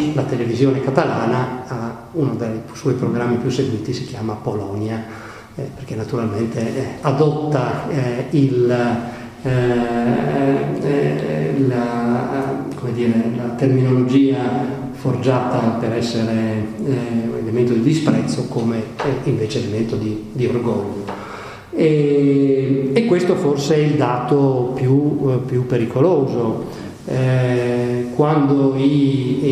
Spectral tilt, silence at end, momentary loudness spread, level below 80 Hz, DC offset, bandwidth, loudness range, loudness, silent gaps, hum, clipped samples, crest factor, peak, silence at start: -7.5 dB/octave; 0 s; 9 LU; -48 dBFS; under 0.1%; 13 kHz; 5 LU; -18 LUFS; none; none; under 0.1%; 18 dB; 0 dBFS; 0 s